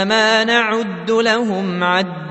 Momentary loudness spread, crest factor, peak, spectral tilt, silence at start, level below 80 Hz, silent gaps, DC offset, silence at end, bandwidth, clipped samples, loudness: 6 LU; 16 dB; 0 dBFS; -4 dB/octave; 0 s; -62 dBFS; none; under 0.1%; 0 s; 8.4 kHz; under 0.1%; -16 LUFS